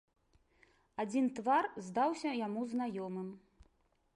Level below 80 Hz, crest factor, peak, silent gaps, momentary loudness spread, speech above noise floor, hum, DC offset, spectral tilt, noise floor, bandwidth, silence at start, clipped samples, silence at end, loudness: -74 dBFS; 16 dB; -22 dBFS; none; 11 LU; 38 dB; none; under 0.1%; -5.5 dB/octave; -74 dBFS; 11 kHz; 1 s; under 0.1%; 0.75 s; -36 LUFS